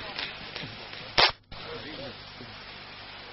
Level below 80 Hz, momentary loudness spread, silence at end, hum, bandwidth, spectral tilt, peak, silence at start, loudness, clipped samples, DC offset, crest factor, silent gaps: -54 dBFS; 20 LU; 0 s; none; 6 kHz; 0 dB/octave; -2 dBFS; 0 s; -29 LUFS; under 0.1%; under 0.1%; 32 dB; none